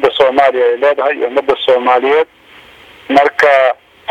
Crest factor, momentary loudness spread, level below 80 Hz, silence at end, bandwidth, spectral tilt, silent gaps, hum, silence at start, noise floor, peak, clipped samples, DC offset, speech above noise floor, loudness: 12 dB; 6 LU; -52 dBFS; 0.35 s; 10.5 kHz; -4 dB/octave; none; none; 0 s; -40 dBFS; 0 dBFS; under 0.1%; under 0.1%; 29 dB; -11 LUFS